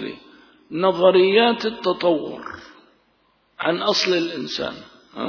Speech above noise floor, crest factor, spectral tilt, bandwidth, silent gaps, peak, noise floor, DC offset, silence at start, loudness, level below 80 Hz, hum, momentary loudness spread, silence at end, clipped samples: 43 dB; 18 dB; -4.5 dB/octave; 5.4 kHz; none; -2 dBFS; -63 dBFS; under 0.1%; 0 s; -19 LUFS; -64 dBFS; none; 21 LU; 0 s; under 0.1%